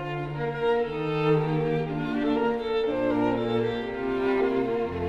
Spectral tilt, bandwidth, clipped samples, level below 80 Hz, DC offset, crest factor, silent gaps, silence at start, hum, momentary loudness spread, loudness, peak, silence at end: -8.5 dB/octave; 7.4 kHz; under 0.1%; -50 dBFS; under 0.1%; 14 dB; none; 0 s; none; 5 LU; -26 LUFS; -12 dBFS; 0 s